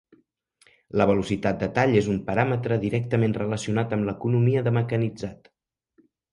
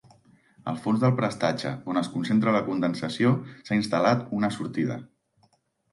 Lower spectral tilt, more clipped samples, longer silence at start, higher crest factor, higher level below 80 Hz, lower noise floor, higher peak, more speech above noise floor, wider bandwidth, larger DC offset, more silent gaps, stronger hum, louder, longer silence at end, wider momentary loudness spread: about the same, -7.5 dB/octave vs -7 dB/octave; neither; first, 0.95 s vs 0.65 s; about the same, 18 dB vs 18 dB; first, -52 dBFS vs -66 dBFS; about the same, -64 dBFS vs -67 dBFS; first, -6 dBFS vs -10 dBFS; about the same, 41 dB vs 42 dB; about the same, 11 kHz vs 11.5 kHz; neither; neither; neither; about the same, -24 LUFS vs -26 LUFS; about the same, 0.95 s vs 0.85 s; about the same, 6 LU vs 8 LU